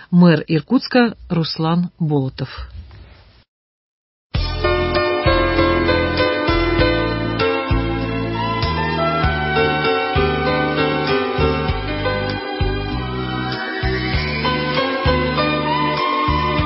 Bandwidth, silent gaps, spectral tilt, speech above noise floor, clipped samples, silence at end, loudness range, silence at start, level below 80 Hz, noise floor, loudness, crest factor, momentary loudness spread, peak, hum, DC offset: 5.8 kHz; 3.48-4.30 s; -10.5 dB/octave; 28 dB; under 0.1%; 0 s; 5 LU; 0 s; -28 dBFS; -44 dBFS; -18 LUFS; 16 dB; 7 LU; -2 dBFS; none; under 0.1%